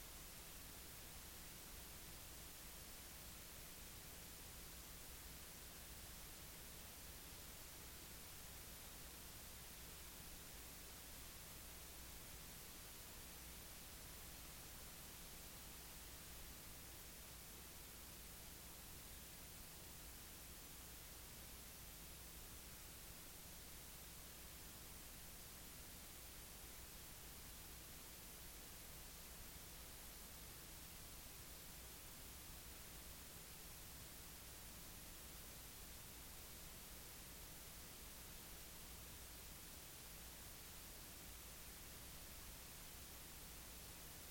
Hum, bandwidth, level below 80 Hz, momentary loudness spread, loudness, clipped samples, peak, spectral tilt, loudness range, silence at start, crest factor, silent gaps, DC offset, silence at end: none; 17 kHz; -64 dBFS; 1 LU; -55 LUFS; under 0.1%; -42 dBFS; -2 dB/octave; 1 LU; 0 s; 14 dB; none; under 0.1%; 0 s